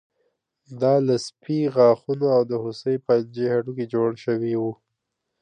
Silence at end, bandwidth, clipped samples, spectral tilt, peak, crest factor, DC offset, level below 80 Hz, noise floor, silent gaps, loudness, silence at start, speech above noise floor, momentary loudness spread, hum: 0.7 s; 9.6 kHz; under 0.1%; -7 dB/octave; -6 dBFS; 18 dB; under 0.1%; -70 dBFS; -80 dBFS; none; -22 LUFS; 0.7 s; 58 dB; 9 LU; none